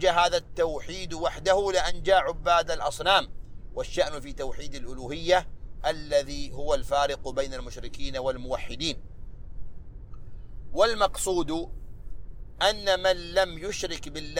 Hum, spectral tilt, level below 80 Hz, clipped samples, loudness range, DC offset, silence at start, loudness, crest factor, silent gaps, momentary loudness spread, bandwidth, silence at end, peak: none; -3 dB/octave; -40 dBFS; under 0.1%; 6 LU; under 0.1%; 0 s; -27 LUFS; 22 dB; none; 24 LU; 16 kHz; 0 s; -6 dBFS